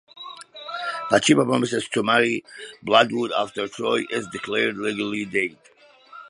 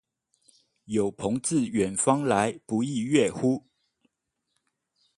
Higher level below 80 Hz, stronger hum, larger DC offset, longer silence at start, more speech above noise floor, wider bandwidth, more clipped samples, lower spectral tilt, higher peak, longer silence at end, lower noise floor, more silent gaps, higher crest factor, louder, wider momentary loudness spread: about the same, -66 dBFS vs -62 dBFS; neither; neither; second, 0.15 s vs 0.9 s; second, 25 dB vs 55 dB; about the same, 11.5 kHz vs 11.5 kHz; neither; about the same, -4 dB/octave vs -5 dB/octave; first, -2 dBFS vs -6 dBFS; second, 0 s vs 1.6 s; second, -47 dBFS vs -80 dBFS; neither; about the same, 22 dB vs 22 dB; first, -22 LUFS vs -26 LUFS; first, 16 LU vs 5 LU